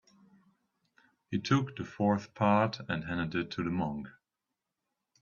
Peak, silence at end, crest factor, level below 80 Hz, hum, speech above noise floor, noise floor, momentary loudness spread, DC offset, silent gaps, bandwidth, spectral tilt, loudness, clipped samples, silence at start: -12 dBFS; 1.1 s; 20 dB; -66 dBFS; none; 57 dB; -88 dBFS; 11 LU; under 0.1%; none; 7.2 kHz; -7 dB/octave; -32 LUFS; under 0.1%; 1.3 s